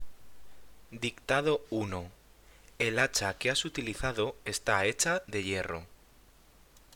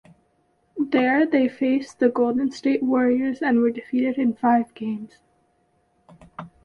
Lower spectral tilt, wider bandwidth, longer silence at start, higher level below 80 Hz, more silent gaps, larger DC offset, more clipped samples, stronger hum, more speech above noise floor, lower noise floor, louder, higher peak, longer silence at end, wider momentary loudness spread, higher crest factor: second, -3 dB/octave vs -6.5 dB/octave; first, over 20 kHz vs 7.4 kHz; second, 0 s vs 0.75 s; first, -54 dBFS vs -64 dBFS; neither; neither; neither; neither; second, 28 dB vs 45 dB; second, -59 dBFS vs -66 dBFS; second, -31 LUFS vs -22 LUFS; second, -12 dBFS vs -6 dBFS; second, 0 s vs 0.2 s; second, 10 LU vs 15 LU; first, 22 dB vs 16 dB